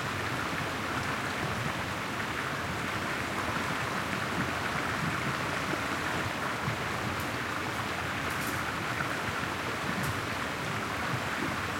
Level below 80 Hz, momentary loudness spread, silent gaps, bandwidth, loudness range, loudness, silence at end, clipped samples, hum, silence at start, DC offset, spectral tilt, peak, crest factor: -56 dBFS; 2 LU; none; 16.5 kHz; 1 LU; -32 LUFS; 0 s; under 0.1%; none; 0 s; under 0.1%; -4 dB/octave; -14 dBFS; 20 dB